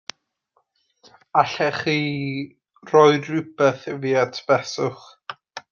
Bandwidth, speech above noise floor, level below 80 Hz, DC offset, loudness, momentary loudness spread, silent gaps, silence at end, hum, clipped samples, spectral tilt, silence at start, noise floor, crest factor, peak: 7.2 kHz; 49 dB; -66 dBFS; under 0.1%; -21 LUFS; 22 LU; none; 0.1 s; none; under 0.1%; -5.5 dB/octave; 1.35 s; -69 dBFS; 20 dB; -2 dBFS